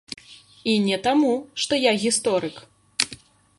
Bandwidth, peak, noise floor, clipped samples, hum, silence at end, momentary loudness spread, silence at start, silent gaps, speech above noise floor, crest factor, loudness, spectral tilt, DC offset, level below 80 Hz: 11.5 kHz; 0 dBFS; -46 dBFS; under 0.1%; none; 0.45 s; 13 LU; 0.1 s; none; 25 dB; 24 dB; -22 LUFS; -3 dB/octave; under 0.1%; -62 dBFS